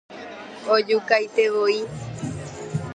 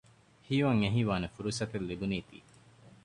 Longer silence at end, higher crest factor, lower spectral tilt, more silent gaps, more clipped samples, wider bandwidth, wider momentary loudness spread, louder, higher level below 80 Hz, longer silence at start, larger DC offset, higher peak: second, 0 s vs 0.15 s; about the same, 18 dB vs 18 dB; about the same, -5 dB/octave vs -6 dB/octave; neither; neither; second, 10 kHz vs 11.5 kHz; first, 16 LU vs 8 LU; first, -22 LUFS vs -32 LUFS; about the same, -54 dBFS vs -56 dBFS; second, 0.1 s vs 0.5 s; neither; first, -4 dBFS vs -14 dBFS